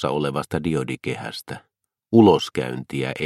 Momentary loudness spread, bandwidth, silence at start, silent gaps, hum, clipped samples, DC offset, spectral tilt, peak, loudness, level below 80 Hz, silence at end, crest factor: 18 LU; 14 kHz; 0 s; none; none; under 0.1%; under 0.1%; -6.5 dB/octave; -2 dBFS; -21 LUFS; -54 dBFS; 0 s; 20 dB